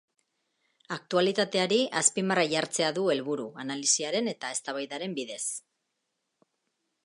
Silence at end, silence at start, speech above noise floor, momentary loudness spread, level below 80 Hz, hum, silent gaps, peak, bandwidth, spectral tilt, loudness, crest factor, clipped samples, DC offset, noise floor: 1.45 s; 0.9 s; 52 dB; 10 LU; -82 dBFS; none; none; -8 dBFS; 11.5 kHz; -2.5 dB/octave; -28 LUFS; 22 dB; under 0.1%; under 0.1%; -81 dBFS